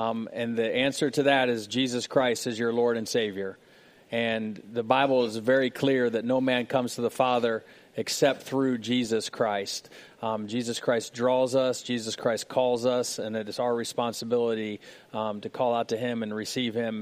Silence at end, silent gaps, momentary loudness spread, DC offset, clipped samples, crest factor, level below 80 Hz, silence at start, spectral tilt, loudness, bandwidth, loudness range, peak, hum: 0 s; none; 8 LU; under 0.1%; under 0.1%; 22 dB; -72 dBFS; 0 s; -4 dB/octave; -27 LUFS; 15.5 kHz; 3 LU; -6 dBFS; none